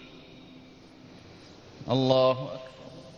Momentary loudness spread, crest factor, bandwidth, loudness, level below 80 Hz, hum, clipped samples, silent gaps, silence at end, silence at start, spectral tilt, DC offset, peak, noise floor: 27 LU; 22 dB; 7.2 kHz; -26 LUFS; -64 dBFS; none; under 0.1%; none; 0.05 s; 0 s; -7 dB/octave; under 0.1%; -8 dBFS; -51 dBFS